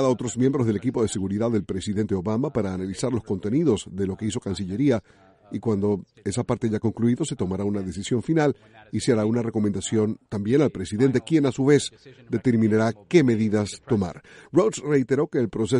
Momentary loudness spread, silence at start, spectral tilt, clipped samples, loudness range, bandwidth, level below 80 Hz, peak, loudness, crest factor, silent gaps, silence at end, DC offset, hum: 8 LU; 0 s; -6.5 dB/octave; under 0.1%; 4 LU; 11.5 kHz; -54 dBFS; -6 dBFS; -24 LUFS; 18 dB; none; 0 s; under 0.1%; none